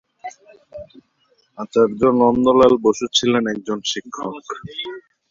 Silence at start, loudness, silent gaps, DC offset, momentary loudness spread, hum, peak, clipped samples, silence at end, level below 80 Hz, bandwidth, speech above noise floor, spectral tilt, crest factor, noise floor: 0.25 s; -18 LUFS; none; under 0.1%; 23 LU; none; -2 dBFS; under 0.1%; 0.3 s; -54 dBFS; 7.6 kHz; 45 dB; -4.5 dB/octave; 18 dB; -62 dBFS